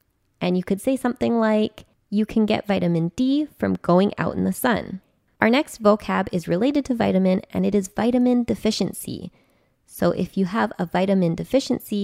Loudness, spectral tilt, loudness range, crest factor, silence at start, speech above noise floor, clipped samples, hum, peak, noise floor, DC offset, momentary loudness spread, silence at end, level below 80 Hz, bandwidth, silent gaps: -22 LUFS; -6.5 dB/octave; 3 LU; 20 dB; 0.4 s; 39 dB; under 0.1%; none; -2 dBFS; -60 dBFS; under 0.1%; 7 LU; 0 s; -52 dBFS; 16 kHz; none